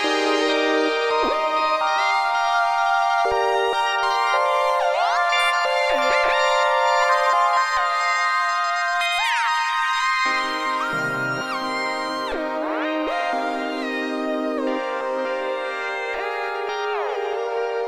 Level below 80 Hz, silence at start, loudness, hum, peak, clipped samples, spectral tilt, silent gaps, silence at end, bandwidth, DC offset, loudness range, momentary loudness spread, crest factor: -56 dBFS; 0 s; -21 LUFS; none; -6 dBFS; under 0.1%; -2.5 dB/octave; none; 0 s; 16 kHz; under 0.1%; 6 LU; 7 LU; 14 dB